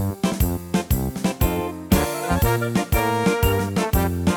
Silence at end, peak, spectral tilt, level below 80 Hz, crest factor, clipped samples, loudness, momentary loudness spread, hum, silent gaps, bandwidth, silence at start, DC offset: 0 s; -4 dBFS; -5.5 dB/octave; -28 dBFS; 18 dB; under 0.1%; -22 LUFS; 4 LU; none; none; over 20 kHz; 0 s; under 0.1%